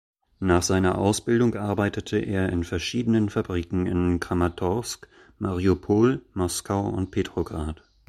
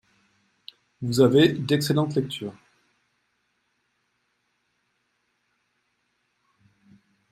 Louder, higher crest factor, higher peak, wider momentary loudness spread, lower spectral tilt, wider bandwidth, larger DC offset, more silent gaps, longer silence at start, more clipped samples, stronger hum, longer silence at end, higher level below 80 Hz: second, -25 LUFS vs -22 LUFS; about the same, 18 dB vs 22 dB; about the same, -6 dBFS vs -6 dBFS; second, 9 LU vs 17 LU; about the same, -6 dB/octave vs -6 dB/octave; about the same, 14.5 kHz vs 15.5 kHz; neither; neither; second, 0.4 s vs 1 s; neither; neither; second, 0.35 s vs 4.8 s; first, -44 dBFS vs -64 dBFS